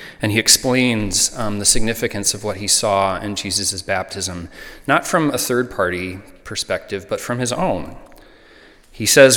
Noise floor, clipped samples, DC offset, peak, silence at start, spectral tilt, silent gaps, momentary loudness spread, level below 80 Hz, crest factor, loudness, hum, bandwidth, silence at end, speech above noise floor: -47 dBFS; under 0.1%; under 0.1%; 0 dBFS; 0 s; -2.5 dB/octave; none; 13 LU; -38 dBFS; 18 dB; -18 LUFS; none; 19 kHz; 0 s; 28 dB